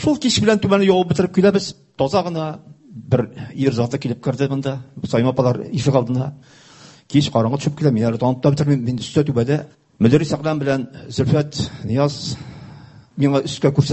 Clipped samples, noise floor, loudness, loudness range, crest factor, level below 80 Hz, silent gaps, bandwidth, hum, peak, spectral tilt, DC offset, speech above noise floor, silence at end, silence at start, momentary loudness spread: under 0.1%; -42 dBFS; -19 LUFS; 3 LU; 18 dB; -46 dBFS; none; 8.4 kHz; none; 0 dBFS; -6.5 dB/octave; under 0.1%; 23 dB; 0 s; 0 s; 12 LU